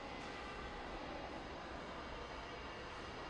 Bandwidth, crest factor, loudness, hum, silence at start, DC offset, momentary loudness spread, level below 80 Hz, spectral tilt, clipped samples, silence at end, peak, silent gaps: 11 kHz; 12 dB; -48 LUFS; none; 0 s; under 0.1%; 1 LU; -58 dBFS; -4.5 dB/octave; under 0.1%; 0 s; -36 dBFS; none